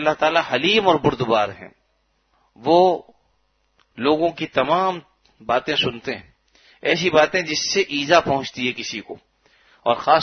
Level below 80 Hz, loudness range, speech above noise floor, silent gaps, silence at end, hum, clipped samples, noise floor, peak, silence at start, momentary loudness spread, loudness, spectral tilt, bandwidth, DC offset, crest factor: -56 dBFS; 3 LU; 47 dB; none; 0 s; none; under 0.1%; -67 dBFS; 0 dBFS; 0 s; 14 LU; -20 LUFS; -4 dB/octave; 6.6 kHz; under 0.1%; 20 dB